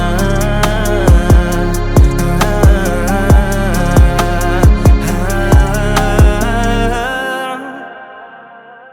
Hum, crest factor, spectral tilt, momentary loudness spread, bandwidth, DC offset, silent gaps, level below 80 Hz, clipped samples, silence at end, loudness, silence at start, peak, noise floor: none; 10 dB; -6 dB/octave; 9 LU; 18 kHz; under 0.1%; none; -14 dBFS; under 0.1%; 0.2 s; -12 LUFS; 0 s; 0 dBFS; -36 dBFS